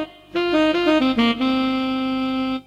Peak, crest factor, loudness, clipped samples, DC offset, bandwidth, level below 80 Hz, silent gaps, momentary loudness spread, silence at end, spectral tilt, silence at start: -4 dBFS; 16 dB; -20 LUFS; under 0.1%; under 0.1%; 9.2 kHz; -50 dBFS; none; 6 LU; 0.05 s; -5 dB/octave; 0 s